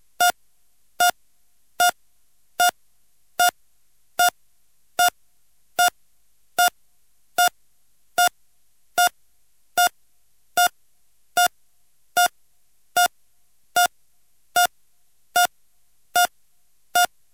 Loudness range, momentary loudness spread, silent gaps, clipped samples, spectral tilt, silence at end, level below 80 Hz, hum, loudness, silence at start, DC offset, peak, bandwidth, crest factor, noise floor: 1 LU; 6 LU; none; under 0.1%; 1.5 dB/octave; 0.3 s; -68 dBFS; none; -22 LUFS; 0.2 s; 0.2%; -4 dBFS; 17 kHz; 20 dB; -67 dBFS